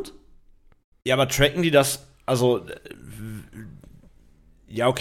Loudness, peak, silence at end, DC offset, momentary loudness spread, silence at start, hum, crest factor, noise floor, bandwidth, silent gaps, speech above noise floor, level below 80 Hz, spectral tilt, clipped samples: -22 LUFS; -4 dBFS; 0 s; under 0.1%; 22 LU; 0 s; none; 22 dB; -54 dBFS; 16.5 kHz; 0.84-0.92 s; 33 dB; -46 dBFS; -4.5 dB/octave; under 0.1%